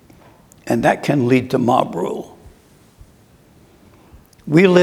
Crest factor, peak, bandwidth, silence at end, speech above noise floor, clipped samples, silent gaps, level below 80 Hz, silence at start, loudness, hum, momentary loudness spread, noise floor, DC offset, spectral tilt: 18 dB; 0 dBFS; 15.5 kHz; 0 s; 35 dB; under 0.1%; none; -52 dBFS; 0.65 s; -17 LUFS; none; 21 LU; -50 dBFS; under 0.1%; -7 dB/octave